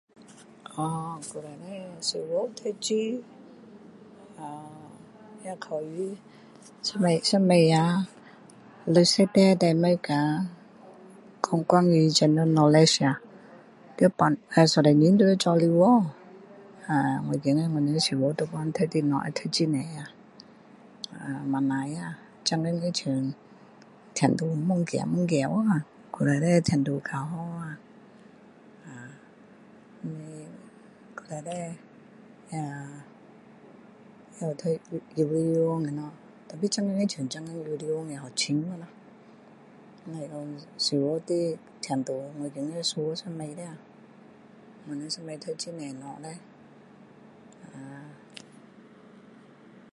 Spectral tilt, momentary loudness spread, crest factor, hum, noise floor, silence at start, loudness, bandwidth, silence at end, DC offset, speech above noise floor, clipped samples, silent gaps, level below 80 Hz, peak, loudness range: -5.5 dB/octave; 23 LU; 24 dB; none; -53 dBFS; 0.7 s; -26 LUFS; 11.5 kHz; 1.8 s; under 0.1%; 27 dB; under 0.1%; none; -68 dBFS; -4 dBFS; 18 LU